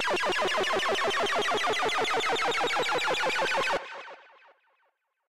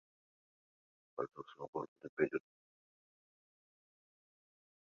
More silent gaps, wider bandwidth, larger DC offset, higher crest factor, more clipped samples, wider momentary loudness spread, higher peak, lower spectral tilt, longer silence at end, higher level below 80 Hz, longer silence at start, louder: second, none vs 1.68-1.73 s, 1.88-1.96 s, 2.09-2.17 s; first, 16 kHz vs 6.8 kHz; first, 0.7% vs under 0.1%; second, 12 dB vs 26 dB; neither; second, 3 LU vs 11 LU; first, -16 dBFS vs -20 dBFS; second, -1.5 dB/octave vs -5.5 dB/octave; second, 0 s vs 2.45 s; first, -64 dBFS vs -86 dBFS; second, 0 s vs 1.15 s; first, -27 LUFS vs -43 LUFS